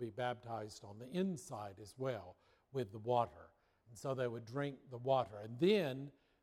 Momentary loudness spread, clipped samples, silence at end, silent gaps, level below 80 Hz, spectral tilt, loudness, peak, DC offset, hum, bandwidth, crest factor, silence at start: 14 LU; under 0.1%; 0.3 s; none; -76 dBFS; -6.5 dB/octave; -41 LUFS; -20 dBFS; under 0.1%; none; 15 kHz; 20 dB; 0 s